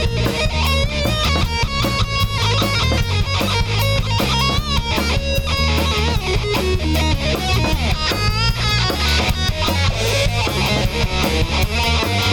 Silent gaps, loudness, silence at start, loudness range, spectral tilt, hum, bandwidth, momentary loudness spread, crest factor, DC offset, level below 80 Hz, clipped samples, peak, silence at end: none; -18 LUFS; 0 s; 1 LU; -4.5 dB/octave; none; 17.5 kHz; 2 LU; 12 dB; under 0.1%; -24 dBFS; under 0.1%; -4 dBFS; 0 s